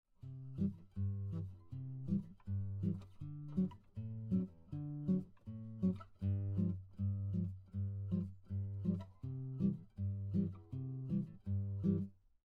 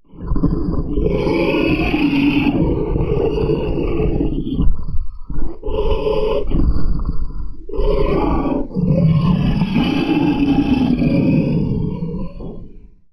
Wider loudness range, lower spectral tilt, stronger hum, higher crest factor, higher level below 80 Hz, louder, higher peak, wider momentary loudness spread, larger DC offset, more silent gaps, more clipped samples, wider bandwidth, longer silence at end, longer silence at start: second, 2 LU vs 5 LU; first, -11.5 dB/octave vs -9 dB/octave; neither; about the same, 16 dB vs 16 dB; second, -66 dBFS vs -22 dBFS; second, -42 LUFS vs -18 LUFS; second, -24 dBFS vs 0 dBFS; second, 10 LU vs 13 LU; neither; neither; neither; second, 3.9 kHz vs 6 kHz; about the same, 0.35 s vs 0.35 s; about the same, 0.25 s vs 0.15 s